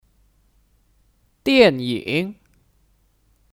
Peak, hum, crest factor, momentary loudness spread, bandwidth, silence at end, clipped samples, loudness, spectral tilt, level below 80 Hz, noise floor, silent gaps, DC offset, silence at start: -2 dBFS; none; 22 dB; 13 LU; 16 kHz; 1.25 s; under 0.1%; -19 LUFS; -6 dB/octave; -56 dBFS; -61 dBFS; none; under 0.1%; 1.45 s